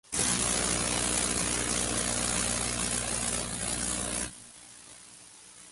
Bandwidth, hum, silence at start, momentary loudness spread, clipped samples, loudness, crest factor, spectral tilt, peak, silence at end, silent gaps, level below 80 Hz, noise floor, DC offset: 12 kHz; none; 0.1 s; 21 LU; under 0.1%; -28 LUFS; 18 dB; -2 dB/octave; -14 dBFS; 0 s; none; -46 dBFS; -52 dBFS; under 0.1%